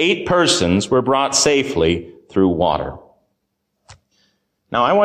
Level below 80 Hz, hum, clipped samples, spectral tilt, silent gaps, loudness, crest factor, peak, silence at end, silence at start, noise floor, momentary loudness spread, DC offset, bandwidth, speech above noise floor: -40 dBFS; none; under 0.1%; -3.5 dB/octave; none; -17 LUFS; 14 dB; -4 dBFS; 0 s; 0 s; -73 dBFS; 10 LU; under 0.1%; 15.5 kHz; 56 dB